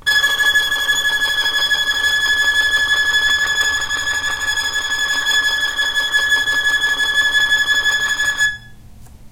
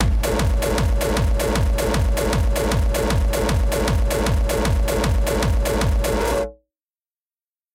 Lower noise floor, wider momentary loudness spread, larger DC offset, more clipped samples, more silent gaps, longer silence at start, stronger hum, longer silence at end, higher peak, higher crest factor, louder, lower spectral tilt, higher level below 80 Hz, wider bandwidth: second, -38 dBFS vs under -90 dBFS; first, 5 LU vs 0 LU; neither; neither; neither; about the same, 0 s vs 0 s; neither; second, 0.05 s vs 1.2 s; about the same, -4 dBFS vs -4 dBFS; about the same, 14 dB vs 16 dB; first, -15 LUFS vs -21 LUFS; second, 1 dB/octave vs -5.5 dB/octave; second, -44 dBFS vs -22 dBFS; about the same, 16 kHz vs 16.5 kHz